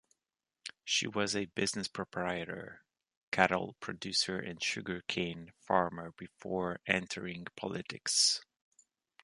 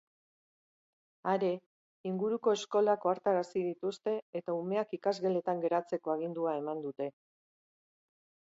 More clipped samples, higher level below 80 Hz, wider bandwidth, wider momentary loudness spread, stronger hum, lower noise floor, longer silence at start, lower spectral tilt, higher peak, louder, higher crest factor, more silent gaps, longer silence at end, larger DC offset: neither; first, -68 dBFS vs -86 dBFS; first, 11.5 kHz vs 8 kHz; first, 16 LU vs 10 LU; neither; about the same, under -90 dBFS vs under -90 dBFS; second, 0.65 s vs 1.25 s; second, -2.5 dB/octave vs -6 dB/octave; first, -8 dBFS vs -16 dBFS; about the same, -34 LUFS vs -34 LUFS; first, 28 dB vs 18 dB; second, 3.17-3.32 s vs 1.66-2.04 s, 4.22-4.33 s; second, 0.8 s vs 1.35 s; neither